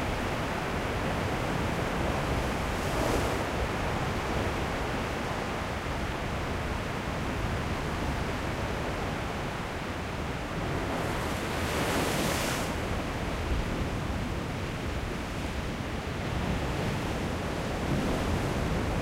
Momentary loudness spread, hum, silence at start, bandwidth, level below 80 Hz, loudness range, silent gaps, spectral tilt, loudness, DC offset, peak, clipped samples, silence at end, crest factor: 5 LU; none; 0 s; 16 kHz; -38 dBFS; 3 LU; none; -5 dB/octave; -31 LUFS; under 0.1%; -16 dBFS; under 0.1%; 0 s; 16 dB